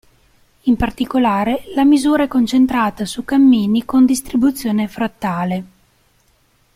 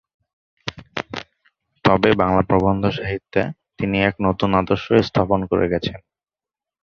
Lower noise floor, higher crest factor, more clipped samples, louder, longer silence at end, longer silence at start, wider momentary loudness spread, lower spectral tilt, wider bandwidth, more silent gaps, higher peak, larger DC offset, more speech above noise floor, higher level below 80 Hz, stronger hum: second, -57 dBFS vs under -90 dBFS; second, 12 dB vs 20 dB; neither; first, -16 LUFS vs -20 LUFS; first, 1.1 s vs 0.85 s; about the same, 0.65 s vs 0.65 s; second, 9 LU vs 14 LU; second, -5.5 dB/octave vs -7.5 dB/octave; first, 15.5 kHz vs 7 kHz; neither; second, -4 dBFS vs 0 dBFS; neither; second, 42 dB vs over 71 dB; about the same, -40 dBFS vs -42 dBFS; neither